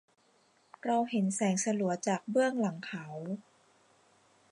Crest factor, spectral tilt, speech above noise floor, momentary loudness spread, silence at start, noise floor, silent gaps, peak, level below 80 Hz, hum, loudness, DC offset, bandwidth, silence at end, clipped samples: 16 dB; -5 dB/octave; 37 dB; 11 LU; 0.85 s; -68 dBFS; none; -18 dBFS; -84 dBFS; none; -32 LUFS; under 0.1%; 11.5 kHz; 1.1 s; under 0.1%